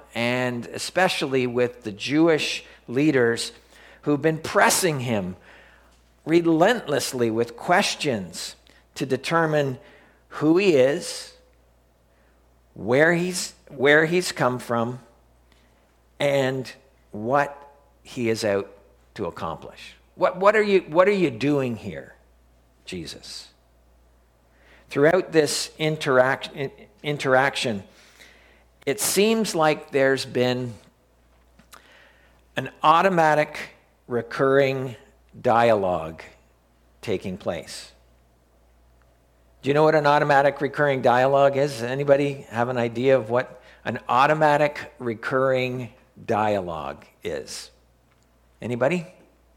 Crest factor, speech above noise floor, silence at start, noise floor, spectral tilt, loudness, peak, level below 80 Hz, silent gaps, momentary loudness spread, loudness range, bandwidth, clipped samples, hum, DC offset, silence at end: 22 dB; 38 dB; 0.15 s; -60 dBFS; -4.5 dB/octave; -22 LUFS; -2 dBFS; -58 dBFS; none; 17 LU; 7 LU; 17 kHz; under 0.1%; none; under 0.1%; 0.45 s